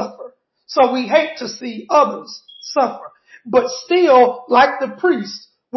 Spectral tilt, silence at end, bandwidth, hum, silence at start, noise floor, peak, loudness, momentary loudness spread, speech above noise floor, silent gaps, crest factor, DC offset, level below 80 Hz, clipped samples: -4 dB/octave; 0 s; 6.2 kHz; none; 0 s; -39 dBFS; -2 dBFS; -16 LUFS; 18 LU; 23 dB; none; 16 dB; under 0.1%; -62 dBFS; under 0.1%